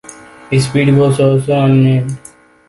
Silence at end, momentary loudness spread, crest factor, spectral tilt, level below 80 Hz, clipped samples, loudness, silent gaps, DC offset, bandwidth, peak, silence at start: 0.5 s; 8 LU; 12 dB; -7 dB/octave; -46 dBFS; under 0.1%; -12 LUFS; none; under 0.1%; 11.5 kHz; 0 dBFS; 0.1 s